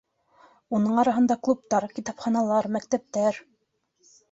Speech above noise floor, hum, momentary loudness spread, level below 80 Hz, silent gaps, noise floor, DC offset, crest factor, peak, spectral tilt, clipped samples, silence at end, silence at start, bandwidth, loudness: 48 dB; none; 8 LU; -68 dBFS; none; -72 dBFS; under 0.1%; 18 dB; -8 dBFS; -6 dB/octave; under 0.1%; 0.9 s; 0.7 s; 8 kHz; -25 LUFS